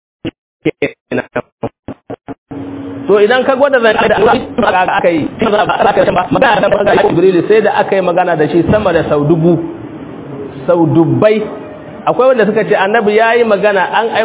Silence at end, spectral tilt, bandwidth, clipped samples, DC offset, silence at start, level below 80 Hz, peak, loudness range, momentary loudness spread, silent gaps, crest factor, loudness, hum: 0 s; -10.5 dB/octave; 4 kHz; 0.3%; under 0.1%; 0.25 s; -40 dBFS; 0 dBFS; 3 LU; 17 LU; 0.38-0.60 s, 1.01-1.06 s, 1.52-1.58 s, 1.79-1.83 s, 2.38-2.46 s; 12 dB; -11 LUFS; none